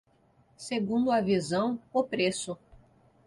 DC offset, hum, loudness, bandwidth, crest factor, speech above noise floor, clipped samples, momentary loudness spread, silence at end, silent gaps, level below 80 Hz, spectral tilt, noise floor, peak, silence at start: under 0.1%; none; -29 LUFS; 11.5 kHz; 16 dB; 36 dB; under 0.1%; 12 LU; 0.5 s; none; -64 dBFS; -5 dB/octave; -65 dBFS; -14 dBFS; 0.6 s